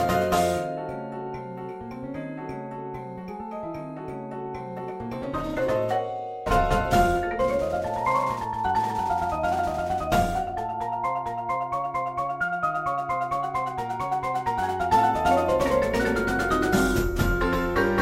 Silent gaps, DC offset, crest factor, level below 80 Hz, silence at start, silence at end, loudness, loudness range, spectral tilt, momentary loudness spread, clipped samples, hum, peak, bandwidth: none; under 0.1%; 18 dB; -38 dBFS; 0 s; 0 s; -26 LUFS; 11 LU; -5.5 dB/octave; 13 LU; under 0.1%; none; -8 dBFS; 16 kHz